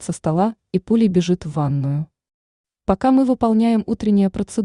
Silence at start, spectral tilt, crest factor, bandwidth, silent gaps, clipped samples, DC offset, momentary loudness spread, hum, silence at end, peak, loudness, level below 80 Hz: 0 s; -7.5 dB/octave; 14 dB; 11 kHz; 2.34-2.64 s; under 0.1%; under 0.1%; 8 LU; none; 0 s; -4 dBFS; -19 LUFS; -46 dBFS